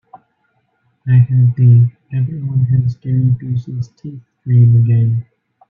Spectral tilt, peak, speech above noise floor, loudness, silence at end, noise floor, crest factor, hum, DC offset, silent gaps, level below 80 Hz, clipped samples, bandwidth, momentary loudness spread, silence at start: -11.5 dB/octave; -2 dBFS; 51 dB; -14 LUFS; 0.45 s; -63 dBFS; 12 dB; none; under 0.1%; none; -48 dBFS; under 0.1%; 2.7 kHz; 16 LU; 1.05 s